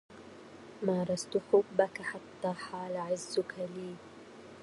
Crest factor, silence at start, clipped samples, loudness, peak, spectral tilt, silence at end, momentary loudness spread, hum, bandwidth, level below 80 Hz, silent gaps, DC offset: 22 dB; 0.1 s; under 0.1%; -34 LUFS; -12 dBFS; -5 dB/octave; 0 s; 23 LU; none; 11.5 kHz; -74 dBFS; none; under 0.1%